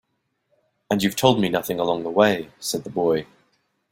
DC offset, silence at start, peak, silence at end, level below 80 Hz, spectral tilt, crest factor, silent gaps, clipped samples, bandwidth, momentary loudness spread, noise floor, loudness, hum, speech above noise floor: under 0.1%; 0.9 s; -2 dBFS; 0.7 s; -58 dBFS; -4.5 dB/octave; 22 dB; none; under 0.1%; 16.5 kHz; 8 LU; -72 dBFS; -22 LUFS; none; 51 dB